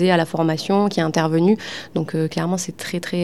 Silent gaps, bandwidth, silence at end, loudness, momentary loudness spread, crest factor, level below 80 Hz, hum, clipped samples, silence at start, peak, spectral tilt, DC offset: none; 14 kHz; 0 s; -20 LUFS; 8 LU; 16 dB; -60 dBFS; none; under 0.1%; 0 s; -4 dBFS; -5.5 dB/octave; 0.4%